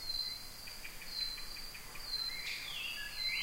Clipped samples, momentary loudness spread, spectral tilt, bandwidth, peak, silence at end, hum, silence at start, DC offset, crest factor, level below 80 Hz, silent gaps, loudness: under 0.1%; 9 LU; 0 dB/octave; 16 kHz; -26 dBFS; 0 s; none; 0 s; under 0.1%; 16 dB; -54 dBFS; none; -40 LUFS